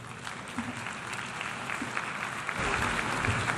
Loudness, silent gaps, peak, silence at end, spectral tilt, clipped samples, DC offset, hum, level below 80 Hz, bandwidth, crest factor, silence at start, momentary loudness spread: -32 LUFS; none; -12 dBFS; 0 s; -3.5 dB/octave; under 0.1%; under 0.1%; none; -50 dBFS; 13 kHz; 20 dB; 0 s; 8 LU